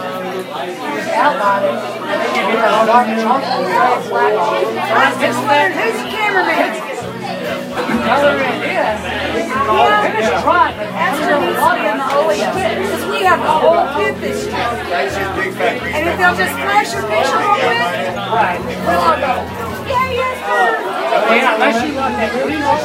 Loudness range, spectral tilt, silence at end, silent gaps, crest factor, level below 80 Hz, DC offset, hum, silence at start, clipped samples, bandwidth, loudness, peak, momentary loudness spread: 2 LU; -4.5 dB/octave; 0 s; none; 14 dB; -46 dBFS; under 0.1%; none; 0 s; under 0.1%; 16 kHz; -15 LUFS; 0 dBFS; 8 LU